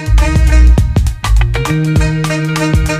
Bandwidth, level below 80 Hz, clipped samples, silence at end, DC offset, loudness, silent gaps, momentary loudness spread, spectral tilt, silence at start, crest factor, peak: 14.5 kHz; -12 dBFS; under 0.1%; 0 s; under 0.1%; -12 LUFS; none; 5 LU; -6 dB/octave; 0 s; 10 dB; 0 dBFS